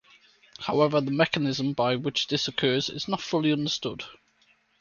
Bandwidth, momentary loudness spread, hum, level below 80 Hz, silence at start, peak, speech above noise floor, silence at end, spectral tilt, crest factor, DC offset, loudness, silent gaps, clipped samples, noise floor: 7.2 kHz; 8 LU; none; -64 dBFS; 0.6 s; -6 dBFS; 39 dB; 0.7 s; -5 dB/octave; 20 dB; under 0.1%; -26 LUFS; none; under 0.1%; -65 dBFS